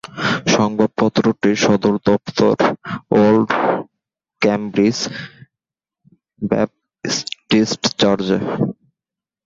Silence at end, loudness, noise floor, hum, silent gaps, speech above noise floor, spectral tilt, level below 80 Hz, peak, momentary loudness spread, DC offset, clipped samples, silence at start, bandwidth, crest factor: 0.75 s; -17 LUFS; -87 dBFS; none; none; 71 dB; -5 dB/octave; -52 dBFS; -2 dBFS; 9 LU; under 0.1%; under 0.1%; 0.1 s; 7.8 kHz; 16 dB